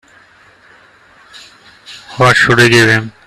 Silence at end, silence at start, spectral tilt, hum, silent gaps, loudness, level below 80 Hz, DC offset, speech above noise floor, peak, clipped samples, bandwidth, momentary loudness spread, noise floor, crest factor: 0.15 s; 1.9 s; -4.5 dB/octave; none; none; -8 LUFS; -46 dBFS; under 0.1%; 36 dB; 0 dBFS; under 0.1%; 14.5 kHz; 21 LU; -45 dBFS; 14 dB